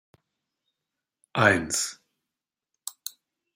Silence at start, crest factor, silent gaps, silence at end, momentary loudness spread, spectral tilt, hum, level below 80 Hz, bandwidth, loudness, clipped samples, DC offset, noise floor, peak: 1.35 s; 26 dB; none; 0.45 s; 19 LU; -3 dB/octave; none; -64 dBFS; 16 kHz; -25 LUFS; under 0.1%; under 0.1%; -88 dBFS; -4 dBFS